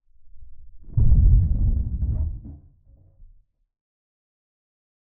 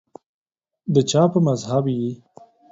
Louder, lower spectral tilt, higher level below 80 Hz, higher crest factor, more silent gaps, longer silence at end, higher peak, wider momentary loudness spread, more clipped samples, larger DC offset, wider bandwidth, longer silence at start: second, -23 LUFS vs -20 LUFS; first, -16.5 dB/octave vs -6.5 dB/octave; first, -24 dBFS vs -60 dBFS; about the same, 18 dB vs 18 dB; neither; first, 2.55 s vs 0.55 s; about the same, -6 dBFS vs -4 dBFS; about the same, 15 LU vs 15 LU; neither; neither; second, 1 kHz vs 8 kHz; second, 0.2 s vs 0.85 s